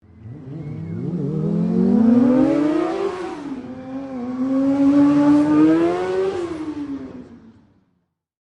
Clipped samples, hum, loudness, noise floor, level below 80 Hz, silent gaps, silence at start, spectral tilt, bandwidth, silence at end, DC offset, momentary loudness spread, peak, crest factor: under 0.1%; none; -18 LUFS; -69 dBFS; -54 dBFS; none; 0.2 s; -8.5 dB/octave; 8.8 kHz; 1.05 s; under 0.1%; 18 LU; -6 dBFS; 14 dB